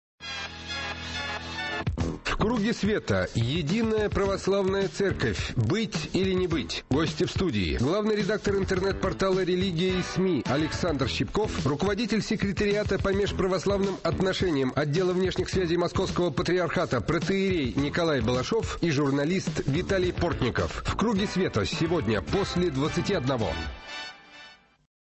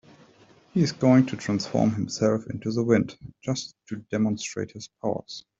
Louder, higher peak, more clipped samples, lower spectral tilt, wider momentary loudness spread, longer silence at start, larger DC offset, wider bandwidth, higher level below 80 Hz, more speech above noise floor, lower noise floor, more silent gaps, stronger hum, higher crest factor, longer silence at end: about the same, -27 LUFS vs -26 LUFS; second, -14 dBFS vs -6 dBFS; neither; about the same, -6 dB/octave vs -6 dB/octave; second, 5 LU vs 14 LU; second, 0.2 s vs 0.75 s; neither; about the same, 8.4 kHz vs 7.8 kHz; first, -42 dBFS vs -60 dBFS; second, 25 dB vs 31 dB; second, -51 dBFS vs -56 dBFS; neither; neither; second, 12 dB vs 20 dB; first, 0.5 s vs 0.2 s